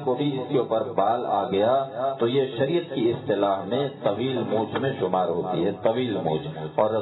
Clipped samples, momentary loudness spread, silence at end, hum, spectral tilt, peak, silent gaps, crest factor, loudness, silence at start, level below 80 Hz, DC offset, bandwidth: under 0.1%; 4 LU; 0 s; none; -10 dB/octave; -8 dBFS; none; 18 dB; -25 LUFS; 0 s; -64 dBFS; under 0.1%; 4.1 kHz